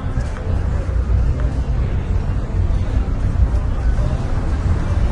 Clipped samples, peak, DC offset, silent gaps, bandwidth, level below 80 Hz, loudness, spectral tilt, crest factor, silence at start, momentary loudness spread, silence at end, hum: under 0.1%; -4 dBFS; under 0.1%; none; 8.4 kHz; -20 dBFS; -21 LUFS; -8 dB/octave; 14 dB; 0 s; 3 LU; 0 s; none